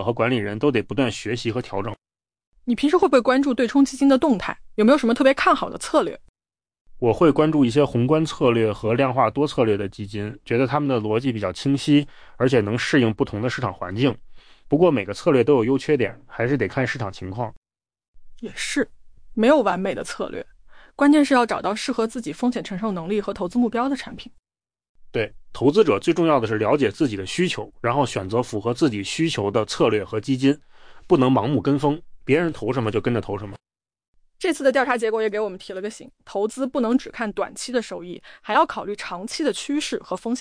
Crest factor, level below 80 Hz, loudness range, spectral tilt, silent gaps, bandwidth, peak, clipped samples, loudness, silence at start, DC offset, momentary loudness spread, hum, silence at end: 16 dB; -50 dBFS; 5 LU; -6 dB/octave; 2.47-2.52 s, 6.29-6.34 s, 6.81-6.85 s, 17.57-17.62 s, 18.08-18.13 s, 24.39-24.43 s, 24.89-24.95 s, 34.08-34.13 s; 10.5 kHz; -6 dBFS; under 0.1%; -21 LUFS; 0 s; under 0.1%; 13 LU; none; 0 s